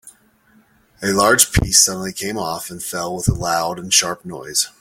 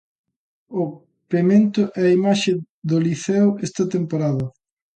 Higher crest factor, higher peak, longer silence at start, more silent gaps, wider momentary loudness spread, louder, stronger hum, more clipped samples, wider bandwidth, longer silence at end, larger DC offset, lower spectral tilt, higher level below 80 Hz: about the same, 20 dB vs 16 dB; first, 0 dBFS vs -4 dBFS; second, 0.05 s vs 0.7 s; second, none vs 2.69-2.82 s; first, 13 LU vs 10 LU; first, -17 LUFS vs -20 LUFS; neither; neither; first, 17 kHz vs 9 kHz; second, 0.15 s vs 0.45 s; neither; second, -2.5 dB/octave vs -6.5 dB/octave; first, -36 dBFS vs -62 dBFS